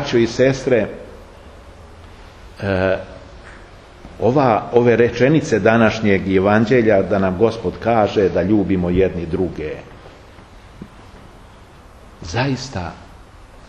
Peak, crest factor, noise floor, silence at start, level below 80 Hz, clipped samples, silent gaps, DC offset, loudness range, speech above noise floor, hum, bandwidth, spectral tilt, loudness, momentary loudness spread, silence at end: 0 dBFS; 18 dB; -42 dBFS; 0 s; -42 dBFS; under 0.1%; none; under 0.1%; 14 LU; 26 dB; none; 9.2 kHz; -7 dB/octave; -17 LUFS; 14 LU; 0.1 s